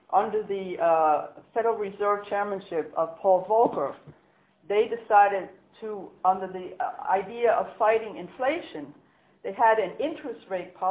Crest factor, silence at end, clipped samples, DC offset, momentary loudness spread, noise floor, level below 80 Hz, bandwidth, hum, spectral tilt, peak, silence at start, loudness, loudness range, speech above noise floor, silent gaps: 20 dB; 0 s; under 0.1%; under 0.1%; 16 LU; -62 dBFS; -70 dBFS; 4 kHz; none; -8.5 dB/octave; -6 dBFS; 0.1 s; -26 LUFS; 2 LU; 36 dB; none